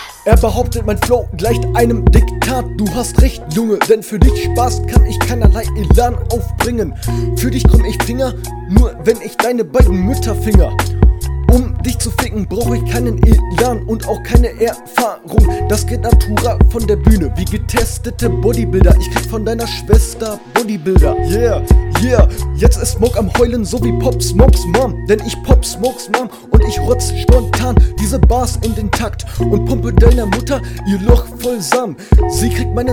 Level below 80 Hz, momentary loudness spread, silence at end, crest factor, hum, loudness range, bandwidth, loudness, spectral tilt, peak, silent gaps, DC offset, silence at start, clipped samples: -16 dBFS; 7 LU; 0 s; 12 dB; none; 1 LU; 16.5 kHz; -14 LUFS; -6 dB/octave; 0 dBFS; none; 0.6%; 0 s; 0.5%